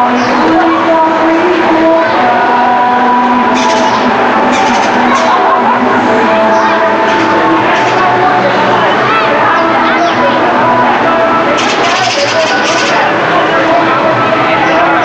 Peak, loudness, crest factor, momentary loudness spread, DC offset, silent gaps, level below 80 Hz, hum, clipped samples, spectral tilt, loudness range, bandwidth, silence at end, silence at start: 0 dBFS; -8 LUFS; 8 dB; 1 LU; under 0.1%; none; -46 dBFS; none; under 0.1%; -4 dB/octave; 0 LU; 8.8 kHz; 0 s; 0 s